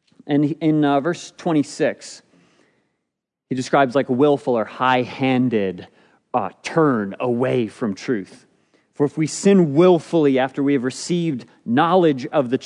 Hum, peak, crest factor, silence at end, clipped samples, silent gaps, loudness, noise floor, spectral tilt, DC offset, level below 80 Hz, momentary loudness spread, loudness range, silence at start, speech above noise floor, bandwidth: none; -2 dBFS; 18 dB; 0 s; under 0.1%; none; -19 LUFS; -80 dBFS; -6 dB/octave; under 0.1%; -72 dBFS; 11 LU; 5 LU; 0.25 s; 61 dB; 10.5 kHz